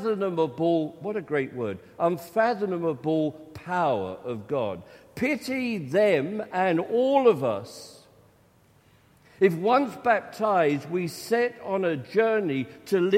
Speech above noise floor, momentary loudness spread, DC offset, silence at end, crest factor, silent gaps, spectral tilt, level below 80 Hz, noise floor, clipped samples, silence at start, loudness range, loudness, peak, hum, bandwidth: 34 dB; 11 LU; under 0.1%; 0 s; 18 dB; none; -6.5 dB/octave; -68 dBFS; -60 dBFS; under 0.1%; 0 s; 3 LU; -26 LUFS; -8 dBFS; none; 16 kHz